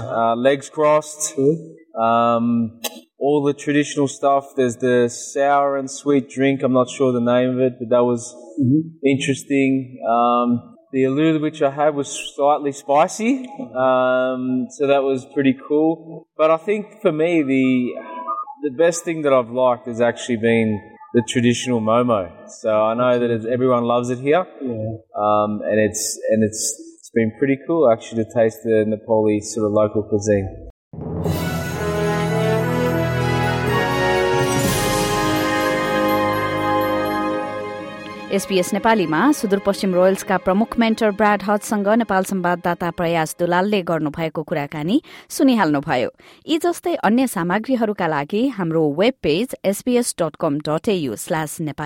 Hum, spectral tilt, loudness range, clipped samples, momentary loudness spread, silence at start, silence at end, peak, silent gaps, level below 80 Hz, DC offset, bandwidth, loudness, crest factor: none; -5.5 dB/octave; 2 LU; under 0.1%; 7 LU; 0 s; 0 s; -4 dBFS; 30.70-30.91 s; -50 dBFS; under 0.1%; 16.5 kHz; -19 LUFS; 14 dB